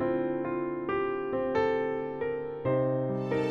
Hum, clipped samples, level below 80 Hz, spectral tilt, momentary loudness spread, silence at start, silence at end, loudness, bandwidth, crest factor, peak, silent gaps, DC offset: none; under 0.1%; -60 dBFS; -8.5 dB/octave; 5 LU; 0 s; 0 s; -30 LUFS; 7.4 kHz; 14 dB; -16 dBFS; none; under 0.1%